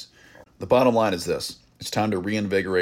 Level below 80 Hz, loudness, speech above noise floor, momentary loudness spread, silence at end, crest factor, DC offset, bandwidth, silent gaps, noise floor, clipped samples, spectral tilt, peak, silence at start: -56 dBFS; -23 LUFS; 29 dB; 16 LU; 0 s; 18 dB; under 0.1%; 16.5 kHz; none; -51 dBFS; under 0.1%; -5 dB/octave; -6 dBFS; 0 s